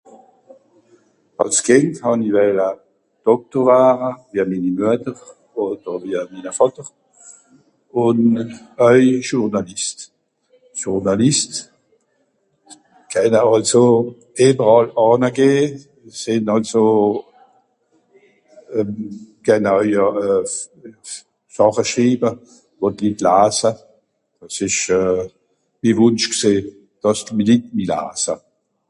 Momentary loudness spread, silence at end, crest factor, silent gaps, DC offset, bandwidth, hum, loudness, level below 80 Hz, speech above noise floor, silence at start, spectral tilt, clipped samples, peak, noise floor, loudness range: 17 LU; 0.5 s; 18 dB; none; under 0.1%; 11.5 kHz; none; -17 LUFS; -56 dBFS; 48 dB; 1.4 s; -4.5 dB/octave; under 0.1%; 0 dBFS; -65 dBFS; 6 LU